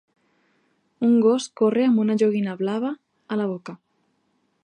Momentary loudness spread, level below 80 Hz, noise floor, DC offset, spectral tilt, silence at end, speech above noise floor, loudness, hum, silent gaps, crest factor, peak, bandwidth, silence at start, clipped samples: 12 LU; -76 dBFS; -69 dBFS; under 0.1%; -6.5 dB/octave; 0.9 s; 48 dB; -22 LUFS; none; none; 16 dB; -8 dBFS; 9.6 kHz; 1 s; under 0.1%